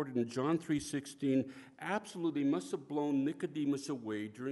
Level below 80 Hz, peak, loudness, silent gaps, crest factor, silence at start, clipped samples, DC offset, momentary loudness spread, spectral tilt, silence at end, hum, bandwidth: -72 dBFS; -20 dBFS; -36 LUFS; none; 16 dB; 0 s; under 0.1%; under 0.1%; 6 LU; -6 dB/octave; 0 s; none; 11.5 kHz